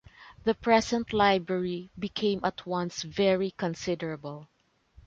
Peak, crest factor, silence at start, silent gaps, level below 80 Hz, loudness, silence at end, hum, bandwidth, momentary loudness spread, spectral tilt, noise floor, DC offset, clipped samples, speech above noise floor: -10 dBFS; 20 dB; 0.2 s; none; -58 dBFS; -28 LUFS; 0.65 s; none; 8 kHz; 12 LU; -5 dB/octave; -59 dBFS; under 0.1%; under 0.1%; 31 dB